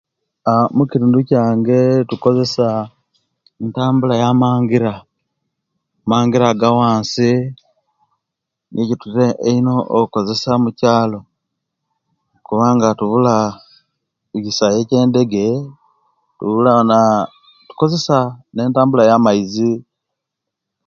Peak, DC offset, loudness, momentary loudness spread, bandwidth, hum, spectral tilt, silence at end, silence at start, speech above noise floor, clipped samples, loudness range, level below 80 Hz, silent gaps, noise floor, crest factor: 0 dBFS; under 0.1%; -15 LUFS; 10 LU; 7.4 kHz; none; -7 dB/octave; 1.05 s; 0.45 s; 66 dB; under 0.1%; 3 LU; -56 dBFS; none; -80 dBFS; 16 dB